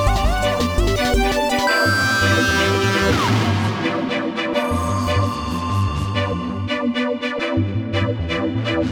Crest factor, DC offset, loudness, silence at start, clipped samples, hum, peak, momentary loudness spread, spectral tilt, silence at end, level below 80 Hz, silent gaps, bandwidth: 14 dB; under 0.1%; -19 LUFS; 0 s; under 0.1%; none; -4 dBFS; 6 LU; -5 dB/octave; 0 s; -28 dBFS; none; over 20 kHz